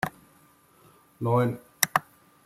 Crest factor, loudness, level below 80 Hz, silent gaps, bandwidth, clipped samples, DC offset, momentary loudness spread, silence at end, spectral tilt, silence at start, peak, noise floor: 30 dB; -27 LUFS; -64 dBFS; none; 16.5 kHz; under 0.1%; under 0.1%; 8 LU; 0.45 s; -4 dB/octave; 0.05 s; 0 dBFS; -59 dBFS